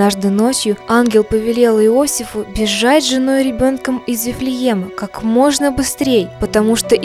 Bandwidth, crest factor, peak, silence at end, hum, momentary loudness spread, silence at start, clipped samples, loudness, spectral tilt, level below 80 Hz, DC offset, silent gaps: 16 kHz; 14 dB; 0 dBFS; 0 s; none; 7 LU; 0 s; under 0.1%; -14 LUFS; -4 dB/octave; -38 dBFS; under 0.1%; none